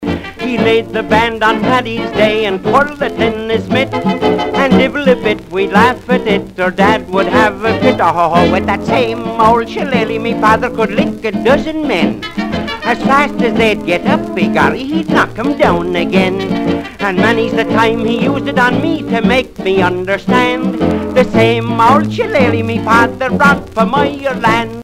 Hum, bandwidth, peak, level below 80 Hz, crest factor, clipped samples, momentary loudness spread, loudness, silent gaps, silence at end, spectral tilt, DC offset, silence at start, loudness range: none; 15.5 kHz; 0 dBFS; -38 dBFS; 12 dB; under 0.1%; 5 LU; -12 LUFS; none; 0 s; -6 dB/octave; under 0.1%; 0 s; 2 LU